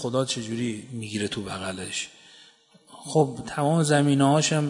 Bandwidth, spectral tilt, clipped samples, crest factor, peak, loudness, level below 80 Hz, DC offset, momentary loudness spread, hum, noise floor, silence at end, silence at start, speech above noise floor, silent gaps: 11 kHz; -5 dB/octave; under 0.1%; 20 dB; -6 dBFS; -25 LUFS; -62 dBFS; under 0.1%; 12 LU; none; -55 dBFS; 0 s; 0 s; 31 dB; none